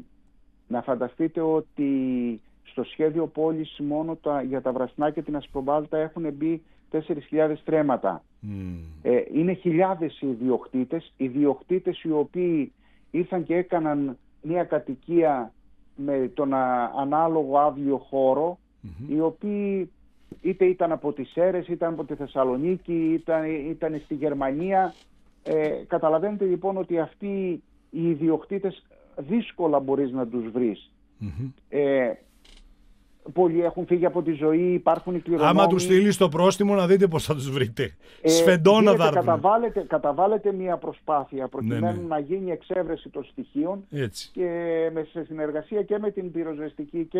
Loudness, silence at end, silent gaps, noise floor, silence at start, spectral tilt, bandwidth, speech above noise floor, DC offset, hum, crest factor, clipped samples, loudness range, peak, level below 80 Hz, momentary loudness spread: -25 LUFS; 0 s; none; -57 dBFS; 0.7 s; -6.5 dB/octave; 14.5 kHz; 33 dB; under 0.1%; none; 18 dB; under 0.1%; 8 LU; -6 dBFS; -58 dBFS; 12 LU